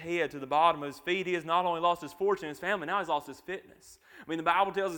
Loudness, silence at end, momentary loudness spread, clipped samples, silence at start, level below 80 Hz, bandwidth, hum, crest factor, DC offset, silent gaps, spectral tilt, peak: -30 LUFS; 0 s; 14 LU; under 0.1%; 0 s; -68 dBFS; 19 kHz; none; 20 dB; under 0.1%; none; -4.5 dB/octave; -12 dBFS